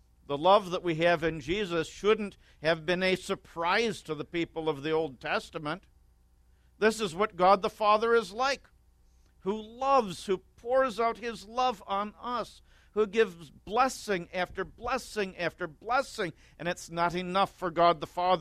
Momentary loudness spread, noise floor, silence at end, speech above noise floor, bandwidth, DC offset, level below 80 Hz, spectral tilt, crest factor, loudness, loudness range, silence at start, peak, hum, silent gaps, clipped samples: 11 LU; -63 dBFS; 0 s; 34 dB; 15 kHz; under 0.1%; -58 dBFS; -4.5 dB/octave; 22 dB; -30 LUFS; 4 LU; 0.3 s; -8 dBFS; none; none; under 0.1%